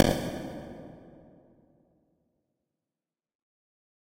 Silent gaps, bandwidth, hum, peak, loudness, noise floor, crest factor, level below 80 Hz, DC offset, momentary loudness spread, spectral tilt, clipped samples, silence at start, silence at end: none; 16 kHz; none; 0 dBFS; -33 LUFS; under -90 dBFS; 34 dB; -52 dBFS; under 0.1%; 24 LU; -5.5 dB/octave; under 0.1%; 0 s; 2.9 s